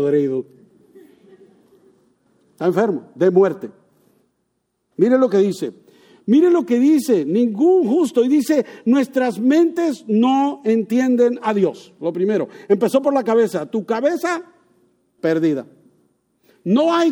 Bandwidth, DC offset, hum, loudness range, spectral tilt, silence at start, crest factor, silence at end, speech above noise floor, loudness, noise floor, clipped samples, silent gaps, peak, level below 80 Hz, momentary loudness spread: 18.5 kHz; under 0.1%; none; 5 LU; -6.5 dB/octave; 0 s; 16 dB; 0 s; 54 dB; -18 LUFS; -71 dBFS; under 0.1%; none; -4 dBFS; -72 dBFS; 9 LU